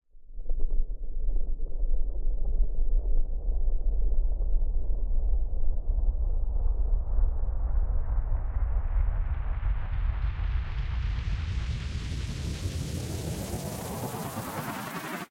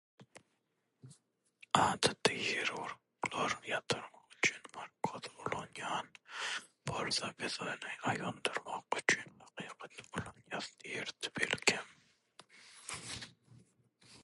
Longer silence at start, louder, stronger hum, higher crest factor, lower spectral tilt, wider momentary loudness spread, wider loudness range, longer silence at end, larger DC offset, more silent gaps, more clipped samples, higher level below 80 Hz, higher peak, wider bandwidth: about the same, 0.15 s vs 0.2 s; first, -33 LUFS vs -37 LUFS; neither; second, 12 dB vs 28 dB; first, -6 dB/octave vs -2.5 dB/octave; second, 4 LU vs 16 LU; about the same, 2 LU vs 4 LU; about the same, 0.05 s vs 0 s; neither; neither; neither; first, -26 dBFS vs -70 dBFS; about the same, -12 dBFS vs -12 dBFS; first, 16 kHz vs 11.5 kHz